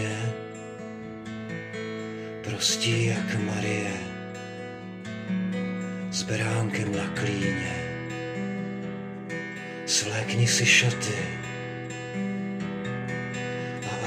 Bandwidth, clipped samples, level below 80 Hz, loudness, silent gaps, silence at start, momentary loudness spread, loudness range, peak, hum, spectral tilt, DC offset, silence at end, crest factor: 15.5 kHz; under 0.1%; -62 dBFS; -28 LUFS; none; 0 s; 14 LU; 6 LU; -8 dBFS; none; -4 dB/octave; under 0.1%; 0 s; 22 dB